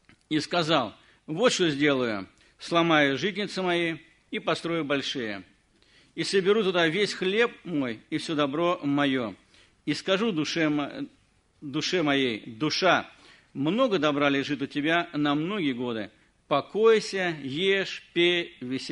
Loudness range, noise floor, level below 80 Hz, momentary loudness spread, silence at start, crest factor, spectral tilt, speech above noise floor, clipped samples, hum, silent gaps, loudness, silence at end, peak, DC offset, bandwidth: 3 LU; -61 dBFS; -68 dBFS; 13 LU; 0.3 s; 20 dB; -4.5 dB/octave; 35 dB; under 0.1%; none; none; -26 LUFS; 0 s; -6 dBFS; under 0.1%; 10.5 kHz